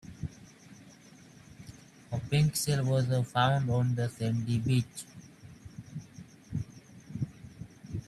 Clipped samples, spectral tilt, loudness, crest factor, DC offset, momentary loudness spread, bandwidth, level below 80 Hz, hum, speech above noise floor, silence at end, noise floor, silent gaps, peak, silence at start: under 0.1%; -5.5 dB/octave; -31 LUFS; 20 dB; under 0.1%; 24 LU; 14 kHz; -58 dBFS; none; 26 dB; 0.05 s; -54 dBFS; none; -12 dBFS; 0.05 s